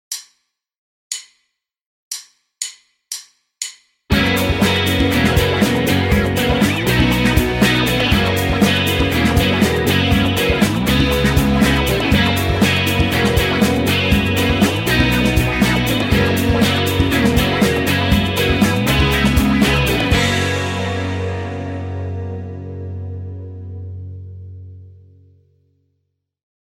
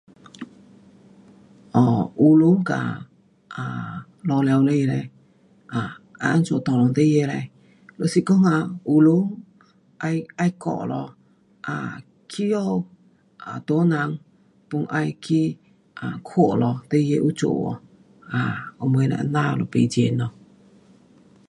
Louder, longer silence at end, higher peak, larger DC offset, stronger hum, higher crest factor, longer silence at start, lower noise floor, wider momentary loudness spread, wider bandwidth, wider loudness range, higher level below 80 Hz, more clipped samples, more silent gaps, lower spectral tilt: first, -15 LUFS vs -22 LUFS; first, 1.8 s vs 1.2 s; about the same, -2 dBFS vs -4 dBFS; neither; neither; about the same, 16 dB vs 18 dB; second, 0.1 s vs 0.4 s; first, -71 dBFS vs -56 dBFS; second, 15 LU vs 18 LU; first, 17 kHz vs 11.5 kHz; first, 15 LU vs 6 LU; first, -28 dBFS vs -62 dBFS; neither; first, 0.78-1.10 s, 1.86-2.11 s vs none; second, -5 dB/octave vs -7.5 dB/octave